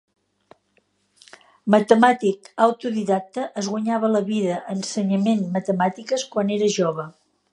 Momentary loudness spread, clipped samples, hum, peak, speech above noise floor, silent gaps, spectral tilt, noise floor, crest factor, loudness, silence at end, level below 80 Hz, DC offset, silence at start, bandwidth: 10 LU; under 0.1%; none; -2 dBFS; 45 dB; none; -5.5 dB/octave; -66 dBFS; 20 dB; -21 LUFS; 0.4 s; -72 dBFS; under 0.1%; 1.65 s; 10.5 kHz